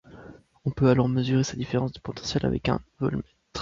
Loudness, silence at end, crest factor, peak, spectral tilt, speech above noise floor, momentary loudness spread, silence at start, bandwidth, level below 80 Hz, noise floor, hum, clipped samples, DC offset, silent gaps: -26 LUFS; 0 s; 20 dB; -8 dBFS; -6.5 dB/octave; 23 dB; 12 LU; 0.1 s; 7.6 kHz; -46 dBFS; -48 dBFS; none; under 0.1%; under 0.1%; none